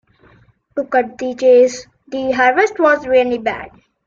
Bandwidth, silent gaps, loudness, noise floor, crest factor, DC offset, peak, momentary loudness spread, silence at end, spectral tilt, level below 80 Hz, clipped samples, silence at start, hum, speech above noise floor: 7.6 kHz; none; -15 LUFS; -51 dBFS; 14 dB; under 0.1%; -2 dBFS; 16 LU; 0.4 s; -4 dB/octave; -54 dBFS; under 0.1%; 0.75 s; none; 37 dB